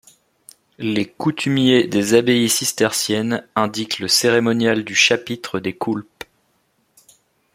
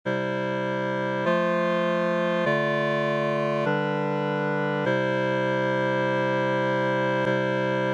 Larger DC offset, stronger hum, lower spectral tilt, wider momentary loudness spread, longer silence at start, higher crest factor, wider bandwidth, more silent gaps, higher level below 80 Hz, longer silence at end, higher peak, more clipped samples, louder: neither; neither; second, -3.5 dB/octave vs -7 dB/octave; first, 11 LU vs 3 LU; first, 0.8 s vs 0.05 s; first, 18 dB vs 12 dB; first, 16.5 kHz vs 9 kHz; neither; first, -60 dBFS vs -76 dBFS; first, 1.55 s vs 0 s; first, 0 dBFS vs -12 dBFS; neither; first, -18 LUFS vs -25 LUFS